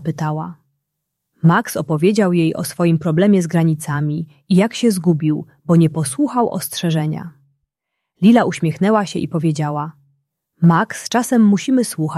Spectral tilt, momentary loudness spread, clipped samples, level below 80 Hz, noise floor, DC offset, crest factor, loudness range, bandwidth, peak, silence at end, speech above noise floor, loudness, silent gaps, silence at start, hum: -6.5 dB/octave; 9 LU; under 0.1%; -58 dBFS; -78 dBFS; under 0.1%; 14 dB; 2 LU; 14 kHz; -2 dBFS; 0 s; 62 dB; -17 LUFS; none; 0 s; none